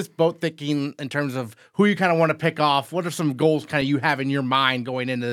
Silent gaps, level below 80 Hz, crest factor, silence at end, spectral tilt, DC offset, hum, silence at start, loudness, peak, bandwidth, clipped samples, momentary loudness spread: none; -68 dBFS; 18 dB; 0 s; -5.5 dB/octave; under 0.1%; none; 0 s; -22 LUFS; -4 dBFS; 16 kHz; under 0.1%; 8 LU